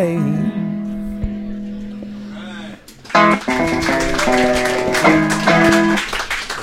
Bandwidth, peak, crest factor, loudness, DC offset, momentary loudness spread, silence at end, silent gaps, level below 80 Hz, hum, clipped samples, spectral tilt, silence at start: 16.5 kHz; 0 dBFS; 16 dB; -16 LUFS; under 0.1%; 18 LU; 0 s; none; -34 dBFS; none; under 0.1%; -4.5 dB/octave; 0 s